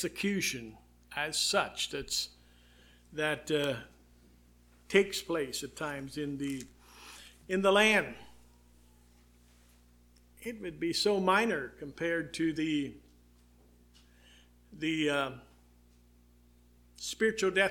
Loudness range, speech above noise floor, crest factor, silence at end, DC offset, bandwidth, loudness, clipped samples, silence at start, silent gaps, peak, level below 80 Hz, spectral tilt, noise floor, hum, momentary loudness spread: 6 LU; 30 dB; 26 dB; 0 s; under 0.1%; 18 kHz; -32 LUFS; under 0.1%; 0 s; none; -10 dBFS; -62 dBFS; -3.5 dB/octave; -62 dBFS; 60 Hz at -60 dBFS; 17 LU